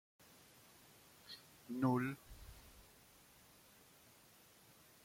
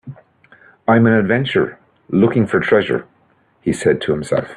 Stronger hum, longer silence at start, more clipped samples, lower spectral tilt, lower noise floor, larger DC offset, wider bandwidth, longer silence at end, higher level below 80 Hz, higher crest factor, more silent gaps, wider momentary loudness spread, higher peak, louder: neither; first, 1.25 s vs 0.05 s; neither; about the same, -6.5 dB/octave vs -6.5 dB/octave; first, -66 dBFS vs -57 dBFS; neither; first, 16.5 kHz vs 11.5 kHz; first, 2.25 s vs 0 s; second, -70 dBFS vs -52 dBFS; first, 22 dB vs 16 dB; neither; first, 25 LU vs 10 LU; second, -26 dBFS vs 0 dBFS; second, -42 LUFS vs -16 LUFS